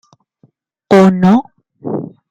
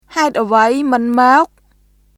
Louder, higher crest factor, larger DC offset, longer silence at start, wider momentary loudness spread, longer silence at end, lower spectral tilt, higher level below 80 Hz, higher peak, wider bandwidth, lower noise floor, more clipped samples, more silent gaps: about the same, -12 LUFS vs -13 LUFS; about the same, 14 dB vs 14 dB; neither; first, 0.9 s vs 0.1 s; first, 15 LU vs 6 LU; second, 0.2 s vs 0.7 s; first, -8 dB/octave vs -4 dB/octave; about the same, -54 dBFS vs -54 dBFS; about the same, 0 dBFS vs 0 dBFS; second, 8.2 kHz vs 14 kHz; about the same, -54 dBFS vs -53 dBFS; neither; neither